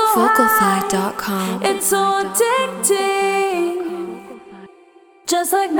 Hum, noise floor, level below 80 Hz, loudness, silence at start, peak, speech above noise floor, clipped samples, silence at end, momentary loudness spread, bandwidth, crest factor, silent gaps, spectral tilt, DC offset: none; -48 dBFS; -56 dBFS; -17 LUFS; 0 s; 0 dBFS; 31 dB; under 0.1%; 0 s; 15 LU; over 20 kHz; 18 dB; none; -3 dB/octave; under 0.1%